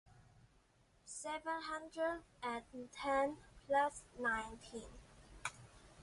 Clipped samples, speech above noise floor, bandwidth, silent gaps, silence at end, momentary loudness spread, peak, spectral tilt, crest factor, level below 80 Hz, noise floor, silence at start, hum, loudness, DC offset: under 0.1%; 31 dB; 11.5 kHz; none; 0 s; 22 LU; -24 dBFS; -3 dB/octave; 20 dB; -66 dBFS; -72 dBFS; 0.1 s; none; -42 LUFS; under 0.1%